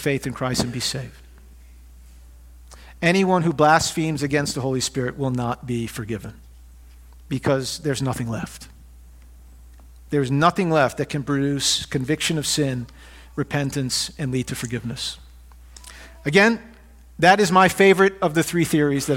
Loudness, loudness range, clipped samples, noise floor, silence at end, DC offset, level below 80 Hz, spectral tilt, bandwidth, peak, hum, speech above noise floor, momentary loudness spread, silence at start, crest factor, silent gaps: -21 LUFS; 9 LU; under 0.1%; -45 dBFS; 0 s; under 0.1%; -46 dBFS; -4.5 dB/octave; 17 kHz; 0 dBFS; none; 24 dB; 15 LU; 0 s; 22 dB; none